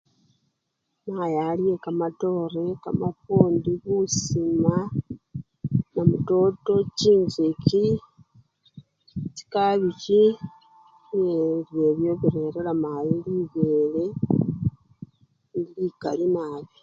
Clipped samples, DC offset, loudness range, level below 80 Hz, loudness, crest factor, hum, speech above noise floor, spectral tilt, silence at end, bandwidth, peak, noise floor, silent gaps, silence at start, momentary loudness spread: under 0.1%; under 0.1%; 4 LU; -54 dBFS; -24 LUFS; 24 dB; none; 55 dB; -7 dB/octave; 0.15 s; 7.6 kHz; 0 dBFS; -78 dBFS; none; 1.05 s; 12 LU